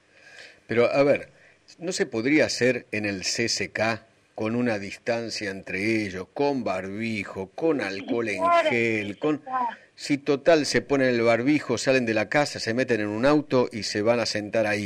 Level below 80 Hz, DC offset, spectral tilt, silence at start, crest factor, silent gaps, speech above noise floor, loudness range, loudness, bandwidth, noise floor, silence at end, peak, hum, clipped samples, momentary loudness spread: -60 dBFS; under 0.1%; -4.5 dB/octave; 0.3 s; 16 dB; none; 24 dB; 5 LU; -25 LUFS; 14 kHz; -49 dBFS; 0 s; -8 dBFS; none; under 0.1%; 9 LU